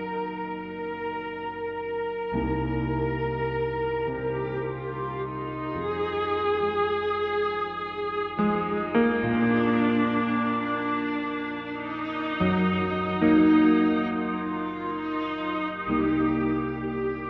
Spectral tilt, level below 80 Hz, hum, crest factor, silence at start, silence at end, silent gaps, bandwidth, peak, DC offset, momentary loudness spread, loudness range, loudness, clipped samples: -9 dB/octave; -48 dBFS; none; 18 dB; 0 s; 0 s; none; 5.4 kHz; -10 dBFS; under 0.1%; 10 LU; 5 LU; -27 LUFS; under 0.1%